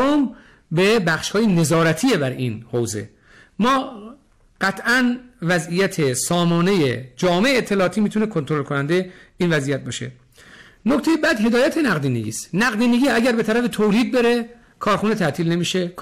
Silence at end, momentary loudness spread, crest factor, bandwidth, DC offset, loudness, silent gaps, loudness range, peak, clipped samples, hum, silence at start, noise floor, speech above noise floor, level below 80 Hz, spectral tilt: 0 s; 9 LU; 8 dB; 16 kHz; under 0.1%; -19 LUFS; none; 4 LU; -12 dBFS; under 0.1%; none; 0 s; -46 dBFS; 27 dB; -52 dBFS; -5 dB/octave